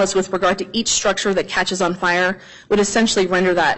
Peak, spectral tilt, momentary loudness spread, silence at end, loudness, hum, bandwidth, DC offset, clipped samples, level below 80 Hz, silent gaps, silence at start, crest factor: -6 dBFS; -3 dB/octave; 4 LU; 0 s; -18 LUFS; none; 8.6 kHz; under 0.1%; under 0.1%; -48 dBFS; none; 0 s; 12 dB